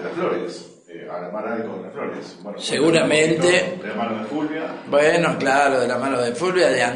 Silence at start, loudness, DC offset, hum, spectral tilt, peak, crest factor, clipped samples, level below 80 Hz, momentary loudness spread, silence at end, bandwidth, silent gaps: 0 s; -20 LUFS; under 0.1%; none; -4 dB/octave; -4 dBFS; 16 dB; under 0.1%; -64 dBFS; 16 LU; 0 s; 10.5 kHz; none